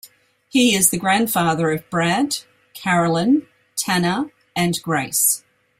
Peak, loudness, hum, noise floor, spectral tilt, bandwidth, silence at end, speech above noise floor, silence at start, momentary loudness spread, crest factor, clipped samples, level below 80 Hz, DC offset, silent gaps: -2 dBFS; -19 LUFS; none; -51 dBFS; -3.5 dB/octave; 16.5 kHz; 0.4 s; 32 dB; 0.05 s; 10 LU; 18 dB; under 0.1%; -58 dBFS; under 0.1%; none